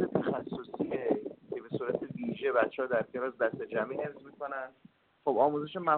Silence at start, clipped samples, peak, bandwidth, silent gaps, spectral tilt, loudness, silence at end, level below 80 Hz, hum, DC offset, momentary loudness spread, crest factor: 0 s; under 0.1%; -12 dBFS; 4.4 kHz; none; -5 dB/octave; -33 LUFS; 0 s; -72 dBFS; none; under 0.1%; 12 LU; 20 dB